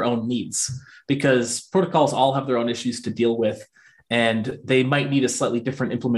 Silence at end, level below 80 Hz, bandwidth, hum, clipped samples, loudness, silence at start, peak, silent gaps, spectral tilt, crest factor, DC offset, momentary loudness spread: 0 s; -62 dBFS; 12.5 kHz; none; under 0.1%; -22 LUFS; 0 s; -4 dBFS; none; -4.5 dB/octave; 18 dB; under 0.1%; 7 LU